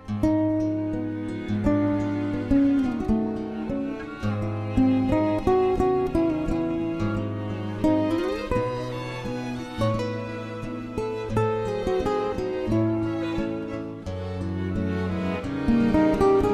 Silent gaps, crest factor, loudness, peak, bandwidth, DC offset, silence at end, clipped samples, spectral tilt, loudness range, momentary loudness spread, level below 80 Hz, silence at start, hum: none; 16 dB; -26 LUFS; -8 dBFS; 12.5 kHz; under 0.1%; 0 s; under 0.1%; -8 dB/octave; 4 LU; 10 LU; -40 dBFS; 0 s; none